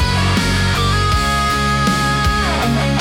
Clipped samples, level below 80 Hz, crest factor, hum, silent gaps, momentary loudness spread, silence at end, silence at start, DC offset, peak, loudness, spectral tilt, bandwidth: under 0.1%; -24 dBFS; 10 dB; none; none; 1 LU; 0 s; 0 s; under 0.1%; -4 dBFS; -15 LUFS; -4.5 dB/octave; 17 kHz